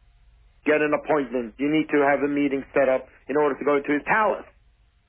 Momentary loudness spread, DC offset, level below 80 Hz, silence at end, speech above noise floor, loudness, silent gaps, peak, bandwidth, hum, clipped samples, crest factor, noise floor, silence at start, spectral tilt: 7 LU; under 0.1%; -56 dBFS; 0.65 s; 37 dB; -23 LUFS; none; -8 dBFS; 3.7 kHz; none; under 0.1%; 16 dB; -60 dBFS; 0.65 s; -9.5 dB/octave